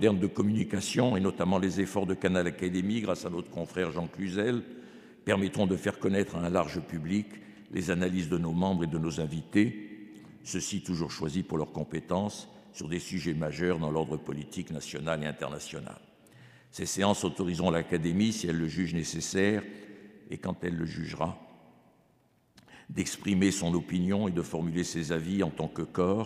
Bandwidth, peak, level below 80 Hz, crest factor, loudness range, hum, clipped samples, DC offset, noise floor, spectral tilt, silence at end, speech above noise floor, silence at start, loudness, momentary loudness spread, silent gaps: 15 kHz; -10 dBFS; -58 dBFS; 22 dB; 5 LU; none; under 0.1%; under 0.1%; -67 dBFS; -5.5 dB/octave; 0 s; 37 dB; 0 s; -31 LUFS; 12 LU; none